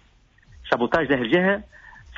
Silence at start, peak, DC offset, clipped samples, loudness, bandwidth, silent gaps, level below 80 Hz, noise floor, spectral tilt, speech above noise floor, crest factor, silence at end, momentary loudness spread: 0.6 s; -8 dBFS; under 0.1%; under 0.1%; -22 LUFS; 7.4 kHz; none; -52 dBFS; -57 dBFS; -4 dB/octave; 35 dB; 16 dB; 0.05 s; 8 LU